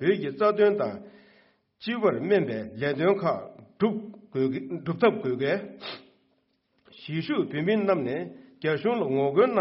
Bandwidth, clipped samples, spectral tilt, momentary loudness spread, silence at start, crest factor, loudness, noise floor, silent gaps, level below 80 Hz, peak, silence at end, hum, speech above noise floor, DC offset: 5.8 kHz; under 0.1%; -5 dB/octave; 15 LU; 0 s; 18 dB; -26 LUFS; -71 dBFS; none; -70 dBFS; -10 dBFS; 0 s; none; 45 dB; under 0.1%